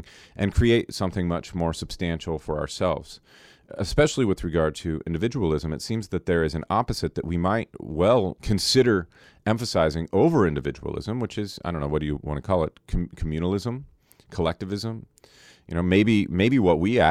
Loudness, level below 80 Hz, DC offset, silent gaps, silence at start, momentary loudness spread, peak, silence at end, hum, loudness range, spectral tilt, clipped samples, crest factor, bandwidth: -25 LUFS; -40 dBFS; under 0.1%; none; 0 s; 11 LU; -6 dBFS; 0 s; none; 6 LU; -6 dB/octave; under 0.1%; 18 dB; 15 kHz